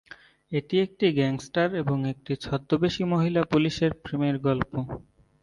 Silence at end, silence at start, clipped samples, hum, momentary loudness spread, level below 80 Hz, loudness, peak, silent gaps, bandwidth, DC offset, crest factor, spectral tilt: 0.45 s; 0.5 s; under 0.1%; none; 9 LU; -54 dBFS; -26 LUFS; -8 dBFS; none; 11 kHz; under 0.1%; 20 dB; -7 dB/octave